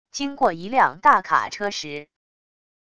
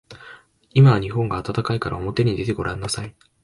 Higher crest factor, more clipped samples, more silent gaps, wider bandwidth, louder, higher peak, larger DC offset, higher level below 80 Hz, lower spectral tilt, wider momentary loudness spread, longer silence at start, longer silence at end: about the same, 20 dB vs 16 dB; neither; neither; about the same, 11 kHz vs 11.5 kHz; about the same, -21 LUFS vs -21 LUFS; about the same, -2 dBFS vs -4 dBFS; first, 0.5% vs under 0.1%; second, -62 dBFS vs -44 dBFS; second, -3 dB/octave vs -6.5 dB/octave; about the same, 14 LU vs 15 LU; about the same, 0.15 s vs 0.1 s; first, 0.8 s vs 0.35 s